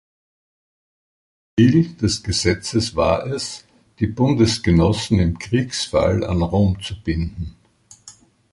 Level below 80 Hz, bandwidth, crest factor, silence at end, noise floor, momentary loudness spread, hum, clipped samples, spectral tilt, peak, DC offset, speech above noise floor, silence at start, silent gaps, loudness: -34 dBFS; 11.5 kHz; 18 dB; 0.4 s; -51 dBFS; 10 LU; none; under 0.1%; -5.5 dB/octave; -2 dBFS; under 0.1%; 33 dB; 1.55 s; none; -19 LUFS